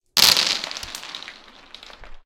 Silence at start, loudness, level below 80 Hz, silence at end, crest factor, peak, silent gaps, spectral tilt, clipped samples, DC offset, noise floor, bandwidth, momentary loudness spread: 0.15 s; -17 LUFS; -50 dBFS; 0.05 s; 22 dB; 0 dBFS; none; 1 dB/octave; under 0.1%; under 0.1%; -45 dBFS; 17 kHz; 21 LU